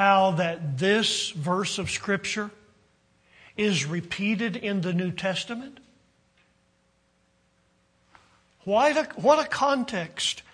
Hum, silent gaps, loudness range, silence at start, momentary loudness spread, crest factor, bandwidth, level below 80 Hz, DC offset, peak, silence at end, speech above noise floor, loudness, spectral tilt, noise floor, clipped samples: none; none; 8 LU; 0 s; 9 LU; 20 dB; 10.5 kHz; -64 dBFS; under 0.1%; -6 dBFS; 0.1 s; 41 dB; -25 LUFS; -4 dB/octave; -67 dBFS; under 0.1%